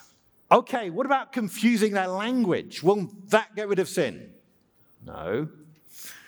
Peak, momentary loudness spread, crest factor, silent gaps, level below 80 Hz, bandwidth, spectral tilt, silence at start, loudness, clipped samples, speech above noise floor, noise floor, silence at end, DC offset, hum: -2 dBFS; 16 LU; 24 dB; none; -66 dBFS; over 20 kHz; -5 dB/octave; 0.5 s; -25 LUFS; under 0.1%; 38 dB; -63 dBFS; 0.1 s; under 0.1%; none